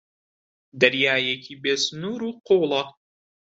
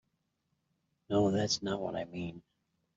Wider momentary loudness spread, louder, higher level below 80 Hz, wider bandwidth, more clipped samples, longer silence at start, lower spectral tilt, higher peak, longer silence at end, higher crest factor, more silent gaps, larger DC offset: about the same, 11 LU vs 12 LU; first, -22 LUFS vs -33 LUFS; about the same, -70 dBFS vs -68 dBFS; about the same, 8 kHz vs 7.8 kHz; neither; second, 0.75 s vs 1.1 s; second, -3.5 dB/octave vs -5 dB/octave; first, -2 dBFS vs -18 dBFS; about the same, 0.6 s vs 0.55 s; about the same, 22 dB vs 18 dB; neither; neither